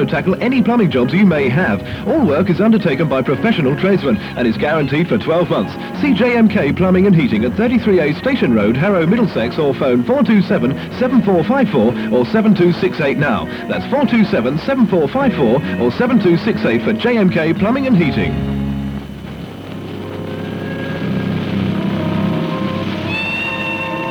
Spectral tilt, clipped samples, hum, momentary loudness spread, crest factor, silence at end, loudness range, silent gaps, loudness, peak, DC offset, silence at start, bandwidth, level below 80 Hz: -8 dB/octave; under 0.1%; none; 9 LU; 12 dB; 0 s; 6 LU; none; -15 LUFS; -2 dBFS; under 0.1%; 0 s; 8.8 kHz; -40 dBFS